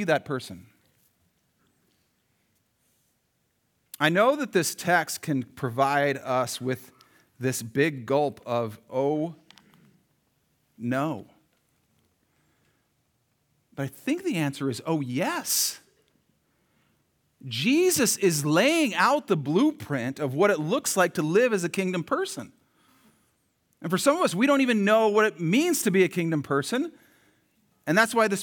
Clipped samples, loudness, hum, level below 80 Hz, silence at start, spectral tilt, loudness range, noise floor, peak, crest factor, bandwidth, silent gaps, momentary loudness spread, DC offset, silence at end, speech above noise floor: under 0.1%; -25 LUFS; none; -76 dBFS; 0 s; -4.5 dB/octave; 12 LU; -73 dBFS; -6 dBFS; 22 dB; over 20 kHz; none; 12 LU; under 0.1%; 0 s; 48 dB